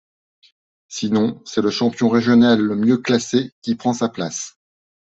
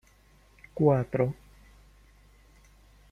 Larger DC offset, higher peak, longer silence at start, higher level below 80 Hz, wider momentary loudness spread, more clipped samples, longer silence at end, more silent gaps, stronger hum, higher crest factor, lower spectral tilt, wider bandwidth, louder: neither; first, -4 dBFS vs -10 dBFS; first, 0.9 s vs 0.75 s; about the same, -60 dBFS vs -56 dBFS; second, 12 LU vs 21 LU; neither; second, 0.55 s vs 1.8 s; first, 3.52-3.62 s vs none; second, none vs 50 Hz at -55 dBFS; second, 16 dB vs 22 dB; second, -5 dB/octave vs -10 dB/octave; second, 8 kHz vs 10.5 kHz; first, -18 LUFS vs -27 LUFS